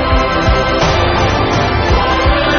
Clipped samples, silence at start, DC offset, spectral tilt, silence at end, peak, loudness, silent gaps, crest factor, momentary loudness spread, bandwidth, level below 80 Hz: under 0.1%; 0 s; under 0.1%; -4 dB/octave; 0 s; 0 dBFS; -12 LUFS; none; 12 dB; 1 LU; 6.8 kHz; -18 dBFS